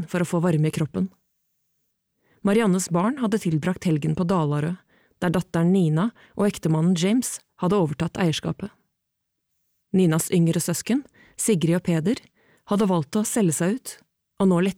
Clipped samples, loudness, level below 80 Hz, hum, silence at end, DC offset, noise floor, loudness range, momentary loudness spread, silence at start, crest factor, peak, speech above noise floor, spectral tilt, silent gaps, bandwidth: under 0.1%; -23 LUFS; -58 dBFS; none; 0.05 s; under 0.1%; -79 dBFS; 2 LU; 8 LU; 0 s; 14 dB; -10 dBFS; 57 dB; -6 dB/octave; none; 16.5 kHz